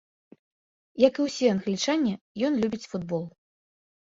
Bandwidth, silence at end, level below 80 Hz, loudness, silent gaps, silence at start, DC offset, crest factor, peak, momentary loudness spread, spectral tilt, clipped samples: 7.8 kHz; 0.85 s; -66 dBFS; -26 LUFS; 2.21-2.35 s; 0.95 s; under 0.1%; 22 dB; -6 dBFS; 11 LU; -5 dB/octave; under 0.1%